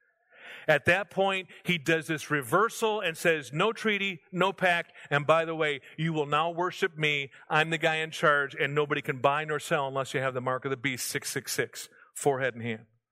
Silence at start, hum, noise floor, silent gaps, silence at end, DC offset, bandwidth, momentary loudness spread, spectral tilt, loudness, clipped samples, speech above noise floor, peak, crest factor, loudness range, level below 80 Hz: 0.4 s; none; -53 dBFS; none; 0.3 s; under 0.1%; 16 kHz; 7 LU; -4 dB/octave; -28 LUFS; under 0.1%; 25 dB; -8 dBFS; 20 dB; 3 LU; -70 dBFS